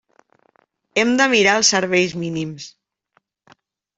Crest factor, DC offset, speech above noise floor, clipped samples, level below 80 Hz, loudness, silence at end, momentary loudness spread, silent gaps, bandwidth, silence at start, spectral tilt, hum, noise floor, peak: 18 dB; under 0.1%; 48 dB; under 0.1%; -62 dBFS; -17 LUFS; 1.3 s; 16 LU; none; 8.2 kHz; 0.95 s; -2.5 dB/octave; none; -66 dBFS; -2 dBFS